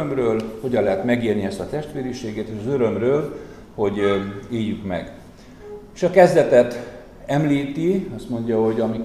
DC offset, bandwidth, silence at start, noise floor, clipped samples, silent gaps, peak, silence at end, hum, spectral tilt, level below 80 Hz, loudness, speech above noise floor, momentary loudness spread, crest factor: 0.1%; 13.5 kHz; 0 s; -41 dBFS; under 0.1%; none; 0 dBFS; 0 s; none; -7 dB/octave; -48 dBFS; -21 LUFS; 21 dB; 17 LU; 20 dB